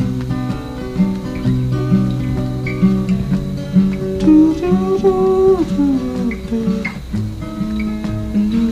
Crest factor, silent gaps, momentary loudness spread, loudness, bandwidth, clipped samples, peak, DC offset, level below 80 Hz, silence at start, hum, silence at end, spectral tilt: 14 dB; none; 10 LU; -17 LUFS; 12 kHz; under 0.1%; -2 dBFS; under 0.1%; -32 dBFS; 0 s; none; 0 s; -8.5 dB/octave